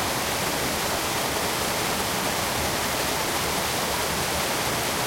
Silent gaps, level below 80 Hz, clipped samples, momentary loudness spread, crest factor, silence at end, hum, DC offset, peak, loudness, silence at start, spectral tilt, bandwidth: none; -46 dBFS; under 0.1%; 0 LU; 14 dB; 0 s; none; under 0.1%; -12 dBFS; -24 LUFS; 0 s; -2.5 dB/octave; 16.5 kHz